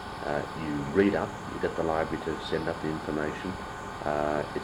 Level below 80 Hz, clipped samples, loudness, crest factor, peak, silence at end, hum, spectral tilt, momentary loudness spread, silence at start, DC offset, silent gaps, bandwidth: -50 dBFS; under 0.1%; -30 LUFS; 20 dB; -10 dBFS; 0 s; none; -6 dB/octave; 10 LU; 0 s; under 0.1%; none; 16 kHz